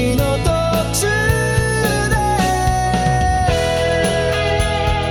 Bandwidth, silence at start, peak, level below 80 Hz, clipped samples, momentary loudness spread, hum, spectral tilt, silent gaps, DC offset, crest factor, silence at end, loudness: 18.5 kHz; 0 s; -2 dBFS; -24 dBFS; under 0.1%; 1 LU; none; -4.5 dB/octave; none; under 0.1%; 14 dB; 0 s; -17 LUFS